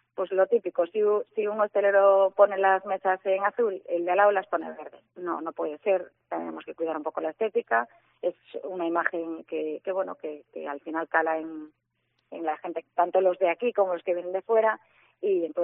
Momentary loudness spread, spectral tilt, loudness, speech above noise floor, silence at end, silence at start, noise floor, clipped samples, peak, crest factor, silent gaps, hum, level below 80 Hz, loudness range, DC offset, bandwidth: 15 LU; -2.5 dB/octave; -27 LUFS; 49 dB; 0 s; 0.15 s; -75 dBFS; under 0.1%; -6 dBFS; 20 dB; none; none; -86 dBFS; 8 LU; under 0.1%; 3.8 kHz